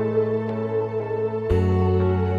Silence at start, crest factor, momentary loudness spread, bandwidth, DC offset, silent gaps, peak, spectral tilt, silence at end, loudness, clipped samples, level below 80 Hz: 0 s; 12 dB; 5 LU; 5.2 kHz; under 0.1%; none; -8 dBFS; -10 dB/octave; 0 s; -23 LUFS; under 0.1%; -40 dBFS